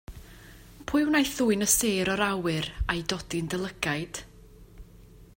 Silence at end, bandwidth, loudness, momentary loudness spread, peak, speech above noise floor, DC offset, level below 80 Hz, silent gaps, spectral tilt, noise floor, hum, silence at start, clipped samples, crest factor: 0.15 s; 16.5 kHz; -27 LUFS; 16 LU; -4 dBFS; 24 dB; under 0.1%; -44 dBFS; none; -3.5 dB/octave; -51 dBFS; none; 0.1 s; under 0.1%; 24 dB